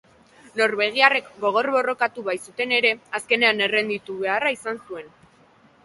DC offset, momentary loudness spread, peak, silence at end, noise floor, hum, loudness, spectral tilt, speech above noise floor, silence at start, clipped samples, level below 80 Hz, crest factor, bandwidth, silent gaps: under 0.1%; 13 LU; 0 dBFS; 0.75 s; -55 dBFS; none; -21 LUFS; -2.5 dB/octave; 33 dB; 0.55 s; under 0.1%; -70 dBFS; 22 dB; 11.5 kHz; none